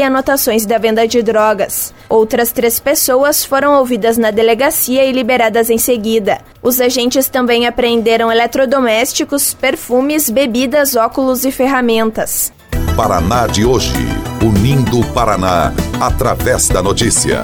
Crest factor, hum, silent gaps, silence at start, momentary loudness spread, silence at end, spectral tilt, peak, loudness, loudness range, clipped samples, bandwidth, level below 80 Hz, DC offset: 12 dB; none; none; 0 s; 4 LU; 0 s; -4 dB/octave; 0 dBFS; -12 LUFS; 2 LU; under 0.1%; over 20 kHz; -28 dBFS; under 0.1%